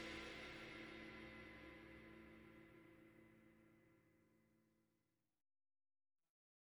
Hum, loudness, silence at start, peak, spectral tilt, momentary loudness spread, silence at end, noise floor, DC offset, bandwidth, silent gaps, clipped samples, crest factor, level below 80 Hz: none; -58 LUFS; 0 s; -40 dBFS; -4.5 dB/octave; 14 LU; 1.9 s; -89 dBFS; under 0.1%; 19 kHz; none; under 0.1%; 20 dB; -76 dBFS